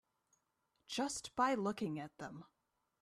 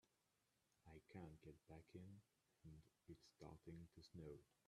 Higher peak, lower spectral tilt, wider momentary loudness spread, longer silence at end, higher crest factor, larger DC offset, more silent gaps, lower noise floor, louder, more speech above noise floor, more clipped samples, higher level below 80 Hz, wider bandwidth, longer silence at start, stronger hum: first, -22 dBFS vs -44 dBFS; second, -4 dB/octave vs -7 dB/octave; first, 16 LU vs 7 LU; first, 0.55 s vs 0.2 s; about the same, 20 dB vs 20 dB; neither; neither; second, -83 dBFS vs -88 dBFS; first, -40 LUFS vs -64 LUFS; first, 44 dB vs 25 dB; neither; about the same, -76 dBFS vs -78 dBFS; first, 14 kHz vs 12.5 kHz; first, 0.9 s vs 0.05 s; neither